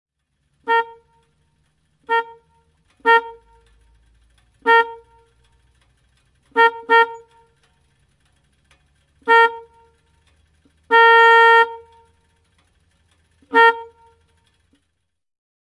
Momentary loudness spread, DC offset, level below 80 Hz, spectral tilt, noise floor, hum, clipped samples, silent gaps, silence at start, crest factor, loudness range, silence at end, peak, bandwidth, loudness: 21 LU; under 0.1%; -64 dBFS; -2 dB/octave; -74 dBFS; none; under 0.1%; none; 0.65 s; 18 dB; 9 LU; 1.85 s; -2 dBFS; 11 kHz; -15 LUFS